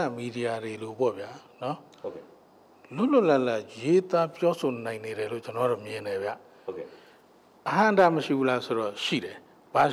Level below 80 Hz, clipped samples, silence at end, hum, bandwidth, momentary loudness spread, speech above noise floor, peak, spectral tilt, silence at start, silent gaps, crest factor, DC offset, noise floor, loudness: -74 dBFS; under 0.1%; 0 s; none; 14.5 kHz; 18 LU; 30 dB; -12 dBFS; -6 dB/octave; 0 s; none; 16 dB; under 0.1%; -57 dBFS; -27 LUFS